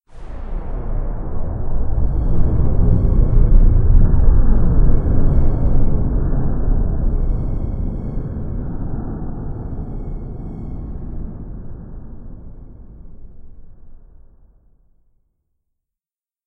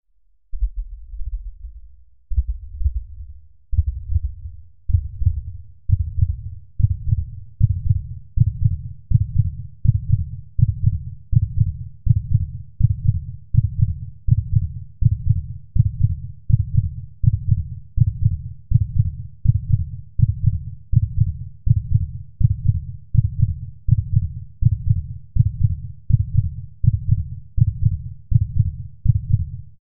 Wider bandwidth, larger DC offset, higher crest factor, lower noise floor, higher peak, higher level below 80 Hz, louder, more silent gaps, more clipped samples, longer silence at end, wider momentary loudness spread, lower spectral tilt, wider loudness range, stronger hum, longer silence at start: first, 1.8 kHz vs 0.4 kHz; second, under 0.1% vs 2%; about the same, 16 dB vs 18 dB; first, under -90 dBFS vs -62 dBFS; about the same, 0 dBFS vs -2 dBFS; first, -18 dBFS vs -28 dBFS; about the same, -21 LUFS vs -22 LUFS; neither; neither; first, 2.5 s vs 0 s; first, 19 LU vs 11 LU; second, -12.5 dB/octave vs -20 dB/octave; first, 18 LU vs 5 LU; neither; first, 0.15 s vs 0 s